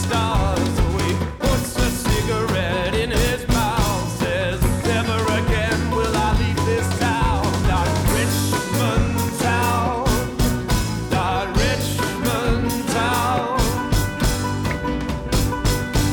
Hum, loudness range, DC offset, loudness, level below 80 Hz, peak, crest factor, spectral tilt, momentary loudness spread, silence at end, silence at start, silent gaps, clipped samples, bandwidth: none; 1 LU; under 0.1%; -20 LUFS; -26 dBFS; -8 dBFS; 10 dB; -5 dB/octave; 3 LU; 0 s; 0 s; none; under 0.1%; 19.5 kHz